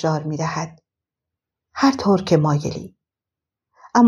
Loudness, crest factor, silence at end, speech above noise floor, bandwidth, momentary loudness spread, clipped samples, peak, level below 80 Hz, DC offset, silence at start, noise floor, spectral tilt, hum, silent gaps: -20 LUFS; 18 dB; 0 s; 68 dB; 11.5 kHz; 17 LU; under 0.1%; -2 dBFS; -56 dBFS; under 0.1%; 0 s; -87 dBFS; -6.5 dB/octave; none; none